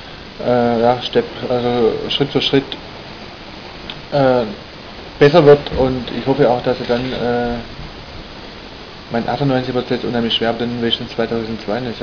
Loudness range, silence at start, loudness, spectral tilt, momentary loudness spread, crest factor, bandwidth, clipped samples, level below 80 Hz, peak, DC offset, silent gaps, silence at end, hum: 6 LU; 0 s; -16 LUFS; -7 dB/octave; 19 LU; 18 dB; 5.4 kHz; under 0.1%; -40 dBFS; 0 dBFS; under 0.1%; none; 0 s; none